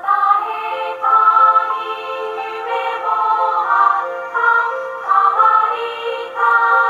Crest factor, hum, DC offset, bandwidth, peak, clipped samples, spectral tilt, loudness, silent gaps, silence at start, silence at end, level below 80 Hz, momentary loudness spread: 14 dB; none; under 0.1%; 7.6 kHz; 0 dBFS; under 0.1%; -2 dB/octave; -15 LUFS; none; 0 s; 0 s; -74 dBFS; 12 LU